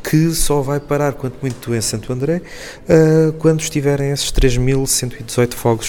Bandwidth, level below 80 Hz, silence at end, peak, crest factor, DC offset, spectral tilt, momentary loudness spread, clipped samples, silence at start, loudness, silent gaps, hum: 18.5 kHz; -28 dBFS; 0 s; 0 dBFS; 16 dB; under 0.1%; -5 dB/octave; 10 LU; under 0.1%; 0 s; -17 LUFS; none; none